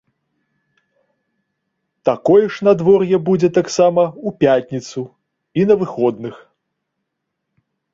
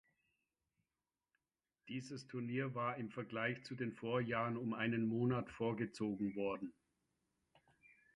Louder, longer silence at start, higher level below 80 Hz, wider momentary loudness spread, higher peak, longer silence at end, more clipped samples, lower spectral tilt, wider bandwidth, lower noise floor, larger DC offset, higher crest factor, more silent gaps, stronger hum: first, -16 LUFS vs -42 LUFS; first, 2.05 s vs 1.85 s; first, -58 dBFS vs -76 dBFS; first, 14 LU vs 9 LU; first, 0 dBFS vs -24 dBFS; about the same, 1.55 s vs 1.45 s; neither; about the same, -6.5 dB/octave vs -7 dB/octave; second, 7.8 kHz vs 11 kHz; second, -76 dBFS vs under -90 dBFS; neither; about the same, 18 dB vs 18 dB; neither; neither